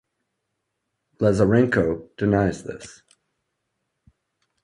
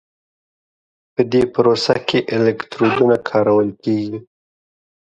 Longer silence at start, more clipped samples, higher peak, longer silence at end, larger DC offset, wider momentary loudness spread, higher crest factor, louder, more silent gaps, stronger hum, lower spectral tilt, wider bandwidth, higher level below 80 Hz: about the same, 1.2 s vs 1.2 s; neither; second, -4 dBFS vs 0 dBFS; first, 1.75 s vs 0.9 s; neither; first, 19 LU vs 7 LU; about the same, 20 dB vs 18 dB; second, -21 LUFS vs -17 LUFS; neither; neither; about the same, -7.5 dB/octave vs -6.5 dB/octave; first, 11 kHz vs 9.4 kHz; first, -48 dBFS vs -54 dBFS